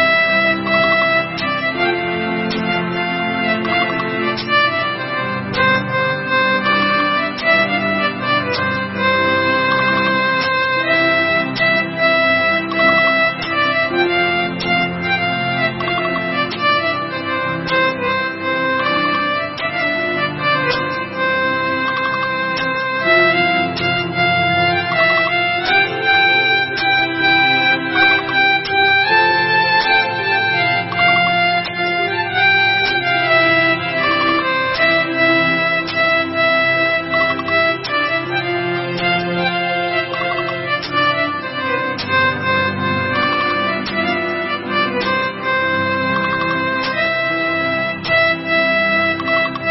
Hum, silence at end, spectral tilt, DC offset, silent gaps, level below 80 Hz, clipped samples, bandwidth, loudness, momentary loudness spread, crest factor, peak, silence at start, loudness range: none; 0 s; -8 dB/octave; under 0.1%; none; -52 dBFS; under 0.1%; 6 kHz; -15 LUFS; 6 LU; 14 dB; -2 dBFS; 0 s; 4 LU